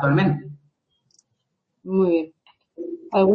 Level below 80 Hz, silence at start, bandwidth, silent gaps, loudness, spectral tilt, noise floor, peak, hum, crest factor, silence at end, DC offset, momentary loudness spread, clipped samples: -60 dBFS; 0 s; 6.2 kHz; none; -23 LUFS; -9.5 dB/octave; -76 dBFS; -6 dBFS; none; 16 dB; 0 s; under 0.1%; 18 LU; under 0.1%